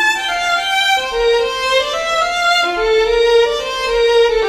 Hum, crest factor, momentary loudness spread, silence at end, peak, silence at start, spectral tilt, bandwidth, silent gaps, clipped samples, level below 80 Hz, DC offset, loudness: none; 14 dB; 4 LU; 0 s; -2 dBFS; 0 s; -1 dB/octave; 14 kHz; none; under 0.1%; -38 dBFS; under 0.1%; -14 LUFS